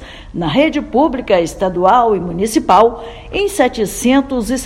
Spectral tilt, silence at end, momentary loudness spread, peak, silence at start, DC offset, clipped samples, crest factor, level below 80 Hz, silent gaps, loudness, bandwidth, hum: -5 dB/octave; 0 s; 8 LU; 0 dBFS; 0 s; under 0.1%; 0.2%; 14 dB; -36 dBFS; none; -14 LUFS; 16.5 kHz; none